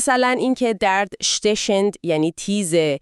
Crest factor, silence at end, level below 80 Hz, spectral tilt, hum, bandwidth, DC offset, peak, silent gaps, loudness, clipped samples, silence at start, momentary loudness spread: 14 dB; 0.05 s; -54 dBFS; -3.5 dB/octave; none; 13.5 kHz; under 0.1%; -4 dBFS; none; -19 LUFS; under 0.1%; 0 s; 4 LU